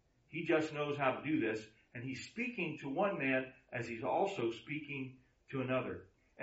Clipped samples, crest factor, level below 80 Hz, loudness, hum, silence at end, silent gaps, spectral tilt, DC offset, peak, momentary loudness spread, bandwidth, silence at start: under 0.1%; 18 dB; -74 dBFS; -38 LUFS; none; 0 s; none; -4.5 dB/octave; under 0.1%; -20 dBFS; 11 LU; 8 kHz; 0.3 s